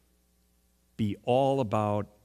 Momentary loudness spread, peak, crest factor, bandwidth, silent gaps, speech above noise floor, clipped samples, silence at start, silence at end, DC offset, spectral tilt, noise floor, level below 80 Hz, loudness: 8 LU; -12 dBFS; 18 dB; 14 kHz; none; 40 dB; under 0.1%; 1 s; 0.2 s; under 0.1%; -7.5 dB/octave; -68 dBFS; -64 dBFS; -28 LUFS